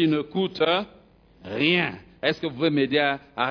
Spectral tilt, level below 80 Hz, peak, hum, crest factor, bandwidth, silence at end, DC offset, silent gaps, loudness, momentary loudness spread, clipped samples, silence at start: -7 dB/octave; -60 dBFS; -6 dBFS; none; 18 dB; 5.4 kHz; 0 s; under 0.1%; none; -24 LUFS; 7 LU; under 0.1%; 0 s